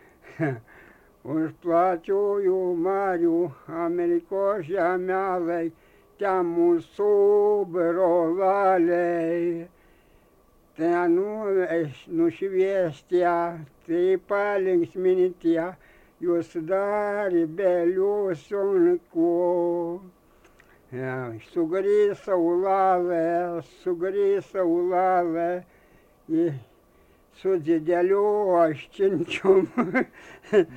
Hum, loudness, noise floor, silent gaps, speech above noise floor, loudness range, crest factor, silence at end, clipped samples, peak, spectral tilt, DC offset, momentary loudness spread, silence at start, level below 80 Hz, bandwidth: none; -24 LUFS; -59 dBFS; none; 35 dB; 4 LU; 16 dB; 0 s; under 0.1%; -8 dBFS; -8 dB/octave; under 0.1%; 9 LU; 0.25 s; -64 dBFS; 8.6 kHz